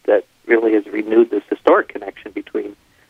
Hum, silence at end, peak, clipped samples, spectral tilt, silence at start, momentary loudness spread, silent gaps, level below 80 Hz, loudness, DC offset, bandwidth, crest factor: none; 0.35 s; 0 dBFS; under 0.1%; -6.5 dB/octave; 0.05 s; 15 LU; none; -62 dBFS; -17 LUFS; under 0.1%; 4.9 kHz; 18 dB